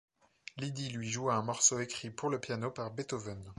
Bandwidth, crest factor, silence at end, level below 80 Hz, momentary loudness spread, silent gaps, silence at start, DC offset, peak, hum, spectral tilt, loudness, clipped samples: 11.5 kHz; 24 dB; 0.05 s; -68 dBFS; 13 LU; none; 0.55 s; under 0.1%; -12 dBFS; none; -3 dB/octave; -34 LUFS; under 0.1%